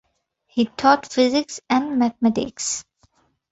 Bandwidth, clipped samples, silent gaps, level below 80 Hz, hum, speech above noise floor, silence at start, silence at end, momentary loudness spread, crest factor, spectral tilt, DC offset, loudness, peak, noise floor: 8.2 kHz; under 0.1%; none; -58 dBFS; none; 47 dB; 0.55 s; 0.7 s; 8 LU; 20 dB; -3.5 dB/octave; under 0.1%; -21 LUFS; -2 dBFS; -67 dBFS